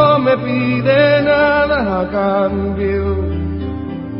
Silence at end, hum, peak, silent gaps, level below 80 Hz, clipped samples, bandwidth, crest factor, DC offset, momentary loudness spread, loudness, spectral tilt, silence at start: 0 s; none; 0 dBFS; none; -28 dBFS; under 0.1%; 5.6 kHz; 14 dB; under 0.1%; 10 LU; -15 LUFS; -12 dB/octave; 0 s